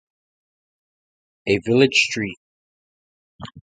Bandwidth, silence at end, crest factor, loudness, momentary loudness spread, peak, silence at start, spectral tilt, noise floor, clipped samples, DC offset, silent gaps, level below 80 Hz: 9.4 kHz; 0.15 s; 22 dB; -19 LUFS; 24 LU; -2 dBFS; 1.45 s; -4 dB/octave; under -90 dBFS; under 0.1%; under 0.1%; 2.37-3.39 s; -58 dBFS